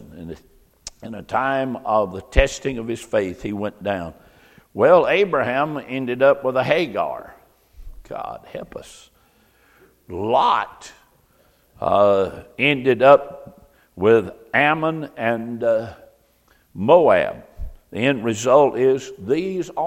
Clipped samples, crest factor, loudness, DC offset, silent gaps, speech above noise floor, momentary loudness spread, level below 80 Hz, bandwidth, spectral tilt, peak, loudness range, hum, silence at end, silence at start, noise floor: under 0.1%; 20 dB; -19 LUFS; under 0.1%; none; 39 dB; 21 LU; -38 dBFS; 14 kHz; -5.5 dB/octave; 0 dBFS; 7 LU; none; 0 s; 0.1 s; -59 dBFS